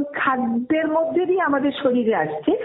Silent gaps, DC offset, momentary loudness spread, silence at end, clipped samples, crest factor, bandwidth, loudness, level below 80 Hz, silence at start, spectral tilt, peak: none; under 0.1%; 2 LU; 0 s; under 0.1%; 14 dB; 4.1 kHz; -21 LUFS; -60 dBFS; 0 s; -3.5 dB/octave; -8 dBFS